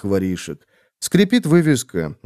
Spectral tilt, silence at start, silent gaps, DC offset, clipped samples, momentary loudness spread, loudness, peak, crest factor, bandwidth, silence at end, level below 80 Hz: -5.5 dB/octave; 0.05 s; none; under 0.1%; under 0.1%; 15 LU; -18 LUFS; -2 dBFS; 18 dB; 15 kHz; 0.1 s; -52 dBFS